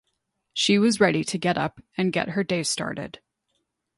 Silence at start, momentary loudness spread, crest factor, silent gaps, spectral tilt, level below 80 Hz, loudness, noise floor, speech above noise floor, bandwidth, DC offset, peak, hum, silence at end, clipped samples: 0.55 s; 12 LU; 18 dB; none; -4 dB/octave; -62 dBFS; -24 LUFS; -76 dBFS; 53 dB; 11.5 kHz; under 0.1%; -6 dBFS; none; 0.9 s; under 0.1%